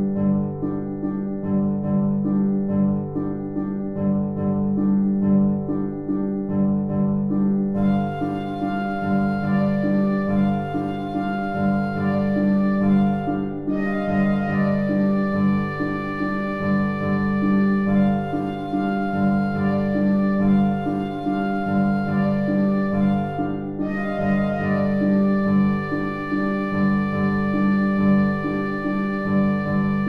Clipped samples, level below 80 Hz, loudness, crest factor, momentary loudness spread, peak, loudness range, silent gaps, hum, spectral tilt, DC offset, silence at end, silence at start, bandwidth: under 0.1%; -46 dBFS; -22 LUFS; 12 dB; 6 LU; -8 dBFS; 2 LU; none; 50 Hz at -45 dBFS; -10 dB/octave; under 0.1%; 0 s; 0 s; 5 kHz